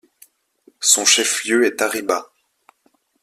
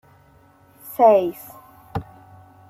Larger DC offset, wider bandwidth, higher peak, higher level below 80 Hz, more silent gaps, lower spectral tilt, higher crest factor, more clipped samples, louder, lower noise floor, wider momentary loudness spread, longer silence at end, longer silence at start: neither; about the same, 16 kHz vs 16 kHz; about the same, 0 dBFS vs -2 dBFS; second, -68 dBFS vs -54 dBFS; neither; second, 0.5 dB/octave vs -7 dB/octave; about the same, 20 dB vs 20 dB; neither; about the same, -16 LUFS vs -17 LUFS; first, -63 dBFS vs -53 dBFS; second, 10 LU vs 23 LU; first, 1 s vs 0.7 s; about the same, 0.8 s vs 0.85 s